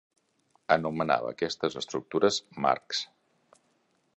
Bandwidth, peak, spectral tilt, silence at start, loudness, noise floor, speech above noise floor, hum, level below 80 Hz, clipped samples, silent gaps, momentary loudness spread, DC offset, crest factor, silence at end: 8.4 kHz; -6 dBFS; -4 dB/octave; 0.7 s; -29 LUFS; -71 dBFS; 43 dB; none; -68 dBFS; under 0.1%; none; 8 LU; under 0.1%; 24 dB; 1.1 s